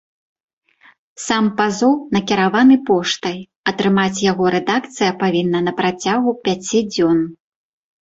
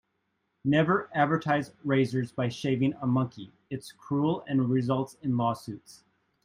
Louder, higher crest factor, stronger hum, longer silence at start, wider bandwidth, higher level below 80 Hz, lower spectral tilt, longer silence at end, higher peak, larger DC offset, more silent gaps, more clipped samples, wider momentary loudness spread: first, -17 LUFS vs -28 LUFS; about the same, 14 dB vs 18 dB; neither; first, 1.2 s vs 0.65 s; second, 8.2 kHz vs 14.5 kHz; first, -56 dBFS vs -68 dBFS; second, -5 dB/octave vs -7.5 dB/octave; first, 0.7 s vs 0.5 s; first, -2 dBFS vs -10 dBFS; neither; first, 3.56-3.64 s vs none; neither; second, 8 LU vs 14 LU